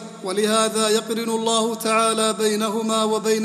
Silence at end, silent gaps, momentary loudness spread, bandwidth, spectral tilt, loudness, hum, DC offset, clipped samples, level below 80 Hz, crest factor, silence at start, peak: 0 s; none; 4 LU; 15.5 kHz; -3 dB/octave; -20 LUFS; none; under 0.1%; under 0.1%; -70 dBFS; 16 dB; 0 s; -4 dBFS